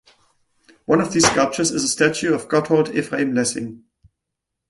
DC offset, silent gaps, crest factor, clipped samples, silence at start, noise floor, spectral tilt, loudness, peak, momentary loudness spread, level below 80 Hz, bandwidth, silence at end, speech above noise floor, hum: under 0.1%; none; 20 dB; under 0.1%; 0.9 s; -81 dBFS; -3.5 dB/octave; -19 LUFS; -2 dBFS; 7 LU; -54 dBFS; 11.5 kHz; 0.95 s; 62 dB; none